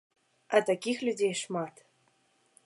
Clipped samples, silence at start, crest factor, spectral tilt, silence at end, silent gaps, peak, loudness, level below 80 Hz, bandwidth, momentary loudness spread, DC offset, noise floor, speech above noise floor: under 0.1%; 0.5 s; 24 dB; -4 dB/octave; 0.95 s; none; -10 dBFS; -30 LUFS; -86 dBFS; 11.5 kHz; 9 LU; under 0.1%; -70 dBFS; 40 dB